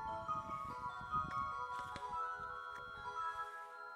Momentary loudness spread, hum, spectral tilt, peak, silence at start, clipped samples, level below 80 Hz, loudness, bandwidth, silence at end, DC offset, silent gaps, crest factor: 6 LU; none; -4.5 dB/octave; -28 dBFS; 0 s; under 0.1%; -66 dBFS; -44 LUFS; 15.5 kHz; 0 s; under 0.1%; none; 16 dB